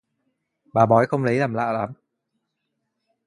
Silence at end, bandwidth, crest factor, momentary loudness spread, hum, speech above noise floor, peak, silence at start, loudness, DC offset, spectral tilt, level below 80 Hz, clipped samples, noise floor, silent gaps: 1.3 s; 10.5 kHz; 22 dB; 10 LU; none; 58 dB; -2 dBFS; 0.75 s; -21 LUFS; under 0.1%; -8 dB/octave; -62 dBFS; under 0.1%; -77 dBFS; none